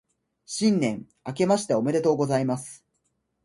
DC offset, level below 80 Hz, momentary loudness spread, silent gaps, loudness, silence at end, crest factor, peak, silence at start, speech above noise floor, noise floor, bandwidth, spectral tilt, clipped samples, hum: under 0.1%; -66 dBFS; 13 LU; none; -25 LUFS; 0.7 s; 18 dB; -8 dBFS; 0.5 s; 50 dB; -75 dBFS; 11.5 kHz; -5.5 dB/octave; under 0.1%; none